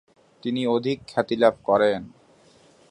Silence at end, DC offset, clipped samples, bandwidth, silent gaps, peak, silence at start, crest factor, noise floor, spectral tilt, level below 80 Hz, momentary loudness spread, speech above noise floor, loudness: 0.8 s; under 0.1%; under 0.1%; 10.5 kHz; none; -4 dBFS; 0.45 s; 22 dB; -56 dBFS; -6.5 dB/octave; -62 dBFS; 10 LU; 33 dB; -23 LUFS